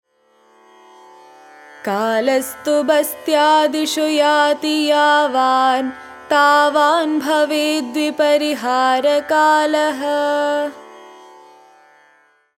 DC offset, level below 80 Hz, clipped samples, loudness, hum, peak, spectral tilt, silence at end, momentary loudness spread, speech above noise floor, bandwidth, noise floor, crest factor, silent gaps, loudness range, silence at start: under 0.1%; -68 dBFS; under 0.1%; -16 LUFS; none; -2 dBFS; -2 dB/octave; 1.5 s; 7 LU; 40 dB; 17 kHz; -56 dBFS; 16 dB; none; 4 LU; 1.85 s